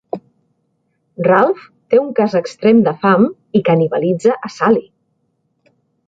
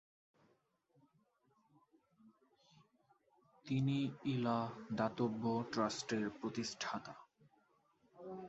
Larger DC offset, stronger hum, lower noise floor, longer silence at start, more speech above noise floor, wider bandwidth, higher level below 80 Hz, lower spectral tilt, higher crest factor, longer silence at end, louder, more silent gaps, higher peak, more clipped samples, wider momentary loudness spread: neither; neither; second, -66 dBFS vs -78 dBFS; second, 0.15 s vs 2.25 s; first, 52 dB vs 39 dB; about the same, 7.8 kHz vs 8 kHz; first, -60 dBFS vs -78 dBFS; first, -7.5 dB/octave vs -5.5 dB/octave; second, 14 dB vs 20 dB; first, 1.25 s vs 0 s; first, -15 LUFS vs -40 LUFS; neither; first, -2 dBFS vs -22 dBFS; neither; second, 6 LU vs 15 LU